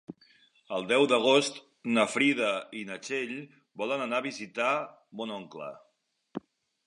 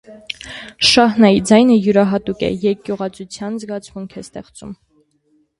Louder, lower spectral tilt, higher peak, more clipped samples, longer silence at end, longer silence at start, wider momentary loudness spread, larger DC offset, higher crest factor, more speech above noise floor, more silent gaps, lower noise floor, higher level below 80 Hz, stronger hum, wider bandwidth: second, -29 LUFS vs -14 LUFS; about the same, -3.5 dB/octave vs -4.5 dB/octave; second, -10 dBFS vs 0 dBFS; neither; second, 0.5 s vs 0.85 s; about the same, 0.1 s vs 0.1 s; about the same, 20 LU vs 22 LU; neither; first, 22 dB vs 16 dB; second, 34 dB vs 45 dB; neither; about the same, -63 dBFS vs -60 dBFS; second, -82 dBFS vs -48 dBFS; neither; about the same, 11.5 kHz vs 11.5 kHz